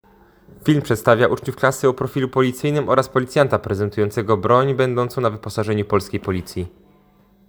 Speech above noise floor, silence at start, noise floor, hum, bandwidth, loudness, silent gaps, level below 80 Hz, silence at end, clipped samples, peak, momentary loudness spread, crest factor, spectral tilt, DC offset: 35 dB; 0.65 s; -54 dBFS; none; over 20 kHz; -19 LUFS; none; -50 dBFS; 0.8 s; under 0.1%; 0 dBFS; 9 LU; 20 dB; -6.5 dB/octave; under 0.1%